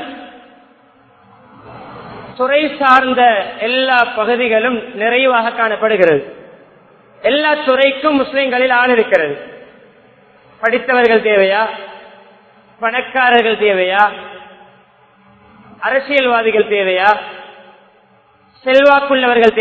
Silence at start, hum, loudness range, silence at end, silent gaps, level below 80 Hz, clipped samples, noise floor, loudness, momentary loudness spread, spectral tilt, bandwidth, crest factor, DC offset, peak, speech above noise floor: 0 s; none; 3 LU; 0 s; none; -56 dBFS; under 0.1%; -50 dBFS; -13 LUFS; 19 LU; -5.5 dB/octave; 8 kHz; 14 dB; under 0.1%; 0 dBFS; 38 dB